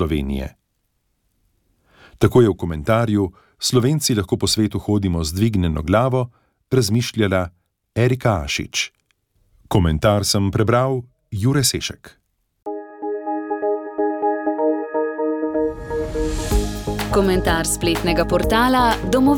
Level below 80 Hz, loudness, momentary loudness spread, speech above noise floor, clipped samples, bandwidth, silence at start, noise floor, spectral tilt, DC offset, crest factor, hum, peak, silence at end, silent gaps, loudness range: -34 dBFS; -20 LUFS; 10 LU; 52 dB; under 0.1%; 18 kHz; 0 s; -70 dBFS; -5 dB/octave; under 0.1%; 18 dB; none; -2 dBFS; 0 s; none; 4 LU